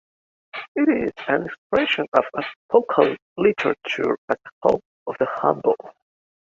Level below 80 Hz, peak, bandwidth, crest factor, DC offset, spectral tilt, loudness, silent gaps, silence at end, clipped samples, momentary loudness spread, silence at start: -60 dBFS; -2 dBFS; 7.4 kHz; 20 dB; under 0.1%; -6 dB/octave; -22 LUFS; 0.68-0.75 s, 1.58-1.70 s, 2.08-2.12 s, 2.56-2.69 s, 3.22-3.36 s, 4.18-4.28 s, 4.52-4.61 s, 4.85-5.06 s; 0.6 s; under 0.1%; 9 LU; 0.55 s